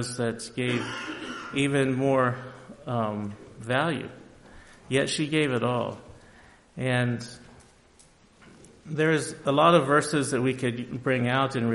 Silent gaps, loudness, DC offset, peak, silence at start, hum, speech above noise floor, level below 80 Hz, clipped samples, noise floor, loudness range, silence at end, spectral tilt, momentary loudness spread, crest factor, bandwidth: none; -26 LUFS; under 0.1%; -6 dBFS; 0 s; none; 31 dB; -60 dBFS; under 0.1%; -57 dBFS; 6 LU; 0 s; -5.5 dB/octave; 13 LU; 20 dB; 11.5 kHz